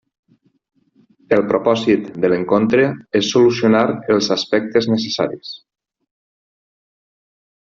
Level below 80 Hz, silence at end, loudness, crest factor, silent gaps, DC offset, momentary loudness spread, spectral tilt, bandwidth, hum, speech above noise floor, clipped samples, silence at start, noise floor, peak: -58 dBFS; 2.1 s; -16 LUFS; 16 dB; none; under 0.1%; 7 LU; -5.5 dB/octave; 7.6 kHz; none; 40 dB; under 0.1%; 1.3 s; -56 dBFS; -2 dBFS